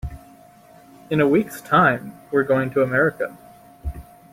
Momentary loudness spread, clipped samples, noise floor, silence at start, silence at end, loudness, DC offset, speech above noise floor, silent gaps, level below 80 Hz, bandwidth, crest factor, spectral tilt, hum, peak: 18 LU; under 0.1%; -48 dBFS; 0.05 s; 0.3 s; -20 LUFS; under 0.1%; 29 dB; none; -42 dBFS; 16.5 kHz; 20 dB; -7 dB/octave; none; -2 dBFS